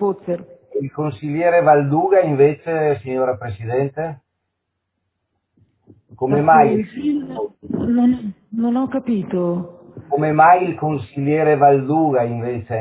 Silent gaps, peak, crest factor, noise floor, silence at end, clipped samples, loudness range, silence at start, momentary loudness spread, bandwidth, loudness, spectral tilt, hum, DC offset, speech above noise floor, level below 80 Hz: none; 0 dBFS; 18 dB; -76 dBFS; 0 s; under 0.1%; 7 LU; 0 s; 14 LU; 4 kHz; -18 LUFS; -12 dB/octave; none; under 0.1%; 59 dB; -52 dBFS